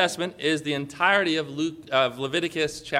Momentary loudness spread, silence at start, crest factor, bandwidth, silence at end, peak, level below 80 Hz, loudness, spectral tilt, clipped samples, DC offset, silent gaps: 8 LU; 0 s; 20 dB; 15.5 kHz; 0 s; -6 dBFS; -62 dBFS; -25 LUFS; -4 dB/octave; under 0.1%; under 0.1%; none